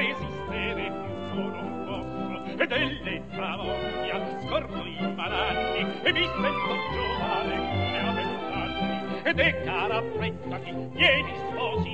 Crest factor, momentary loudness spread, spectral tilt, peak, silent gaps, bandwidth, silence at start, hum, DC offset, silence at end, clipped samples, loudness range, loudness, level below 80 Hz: 22 dB; 10 LU; -6.5 dB/octave; -8 dBFS; none; 8.4 kHz; 0 s; none; 0.5%; 0 s; under 0.1%; 4 LU; -28 LUFS; -48 dBFS